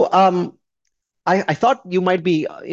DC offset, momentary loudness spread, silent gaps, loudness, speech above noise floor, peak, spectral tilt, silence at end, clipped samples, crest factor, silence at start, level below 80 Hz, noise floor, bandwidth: under 0.1%; 9 LU; none; -18 LUFS; 57 dB; -2 dBFS; -6.5 dB/octave; 0 s; under 0.1%; 16 dB; 0 s; -64 dBFS; -75 dBFS; 7.6 kHz